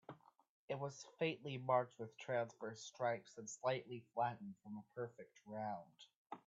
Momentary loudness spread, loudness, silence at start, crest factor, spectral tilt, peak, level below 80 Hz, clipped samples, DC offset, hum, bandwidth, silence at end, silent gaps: 15 LU; -45 LUFS; 0.1 s; 22 dB; -4.5 dB/octave; -24 dBFS; -90 dBFS; under 0.1%; under 0.1%; none; 8 kHz; 0.1 s; 0.50-0.68 s, 6.16-6.25 s